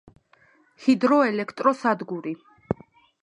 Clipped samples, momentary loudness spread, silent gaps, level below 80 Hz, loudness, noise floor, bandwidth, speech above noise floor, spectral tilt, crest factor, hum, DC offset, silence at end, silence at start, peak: under 0.1%; 13 LU; none; -60 dBFS; -24 LUFS; -60 dBFS; 10 kHz; 37 dB; -6.5 dB/octave; 20 dB; none; under 0.1%; 0.5 s; 0.8 s; -4 dBFS